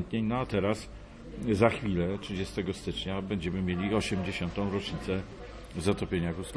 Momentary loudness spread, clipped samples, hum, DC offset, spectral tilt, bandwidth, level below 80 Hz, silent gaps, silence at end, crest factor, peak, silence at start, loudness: 11 LU; under 0.1%; none; under 0.1%; -6 dB/octave; 11 kHz; -48 dBFS; none; 0 s; 20 dB; -10 dBFS; 0 s; -31 LUFS